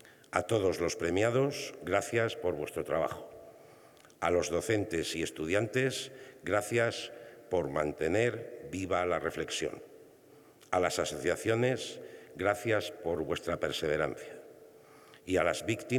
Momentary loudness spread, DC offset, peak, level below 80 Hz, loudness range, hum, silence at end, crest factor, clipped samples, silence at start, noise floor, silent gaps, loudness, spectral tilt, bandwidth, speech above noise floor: 13 LU; under 0.1%; -10 dBFS; -64 dBFS; 2 LU; none; 0 s; 22 dB; under 0.1%; 0.05 s; -58 dBFS; none; -32 LUFS; -4.5 dB/octave; 19 kHz; 26 dB